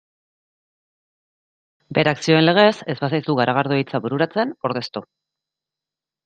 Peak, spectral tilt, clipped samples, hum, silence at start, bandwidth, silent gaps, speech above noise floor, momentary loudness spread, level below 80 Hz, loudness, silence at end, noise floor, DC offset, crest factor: -2 dBFS; -6 dB/octave; under 0.1%; none; 1.9 s; 9.2 kHz; none; 69 dB; 10 LU; -64 dBFS; -19 LUFS; 1.25 s; -88 dBFS; under 0.1%; 20 dB